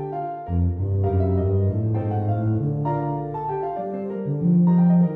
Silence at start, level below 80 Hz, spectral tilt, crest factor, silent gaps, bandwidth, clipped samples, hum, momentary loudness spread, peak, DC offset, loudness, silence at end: 0 s; -42 dBFS; -13 dB/octave; 12 dB; none; 2.9 kHz; under 0.1%; none; 11 LU; -10 dBFS; under 0.1%; -23 LUFS; 0 s